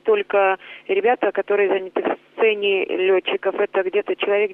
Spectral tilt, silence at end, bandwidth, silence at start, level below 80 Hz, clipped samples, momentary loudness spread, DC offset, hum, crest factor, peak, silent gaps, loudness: -6.5 dB/octave; 0 s; 3.8 kHz; 0.05 s; -70 dBFS; under 0.1%; 5 LU; under 0.1%; none; 14 dB; -6 dBFS; none; -20 LUFS